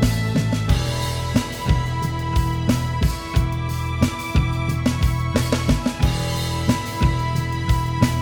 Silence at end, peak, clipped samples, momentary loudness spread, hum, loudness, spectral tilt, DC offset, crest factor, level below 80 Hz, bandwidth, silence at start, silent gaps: 0 s; -2 dBFS; under 0.1%; 3 LU; none; -22 LUFS; -6 dB/octave; under 0.1%; 18 dB; -28 dBFS; over 20 kHz; 0 s; none